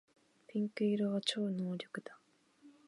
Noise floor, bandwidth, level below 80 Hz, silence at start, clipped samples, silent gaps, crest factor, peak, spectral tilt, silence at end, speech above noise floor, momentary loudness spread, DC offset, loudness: -66 dBFS; 11.5 kHz; -88 dBFS; 0.5 s; under 0.1%; none; 20 dB; -20 dBFS; -5.5 dB/octave; 0.2 s; 29 dB; 13 LU; under 0.1%; -37 LUFS